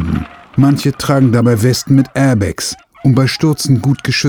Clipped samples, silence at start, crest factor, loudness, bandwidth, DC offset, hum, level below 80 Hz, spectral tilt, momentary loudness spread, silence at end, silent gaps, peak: under 0.1%; 0 s; 12 dB; -13 LUFS; 18.5 kHz; under 0.1%; none; -36 dBFS; -6 dB/octave; 8 LU; 0 s; none; 0 dBFS